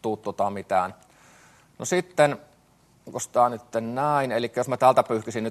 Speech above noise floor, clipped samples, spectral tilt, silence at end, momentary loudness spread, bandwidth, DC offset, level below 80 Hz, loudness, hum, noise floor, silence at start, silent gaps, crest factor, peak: 36 dB; under 0.1%; -5 dB/octave; 0 s; 13 LU; 13 kHz; under 0.1%; -68 dBFS; -24 LUFS; none; -60 dBFS; 0.05 s; none; 22 dB; -4 dBFS